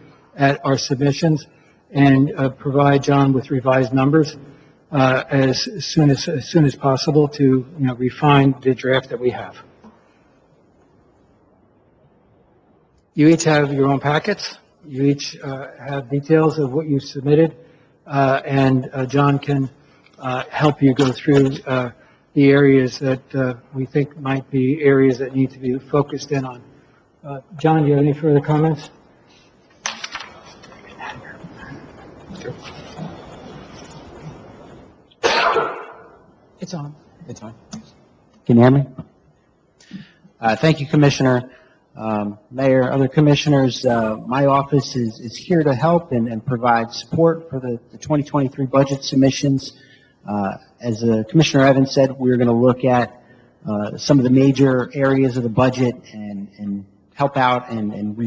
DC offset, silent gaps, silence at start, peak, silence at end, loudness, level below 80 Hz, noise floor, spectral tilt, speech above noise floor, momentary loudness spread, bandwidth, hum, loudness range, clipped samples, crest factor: under 0.1%; none; 0.35 s; 0 dBFS; 0 s; -18 LUFS; -52 dBFS; -58 dBFS; -6.5 dB/octave; 41 dB; 19 LU; 8 kHz; none; 8 LU; under 0.1%; 18 dB